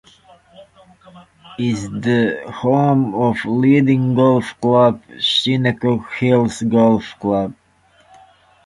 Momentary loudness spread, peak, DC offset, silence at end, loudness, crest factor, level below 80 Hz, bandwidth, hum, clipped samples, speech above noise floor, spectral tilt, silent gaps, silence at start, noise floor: 8 LU; -2 dBFS; under 0.1%; 1.15 s; -16 LUFS; 16 dB; -52 dBFS; 11.5 kHz; none; under 0.1%; 39 dB; -6.5 dB/octave; none; 0.6 s; -54 dBFS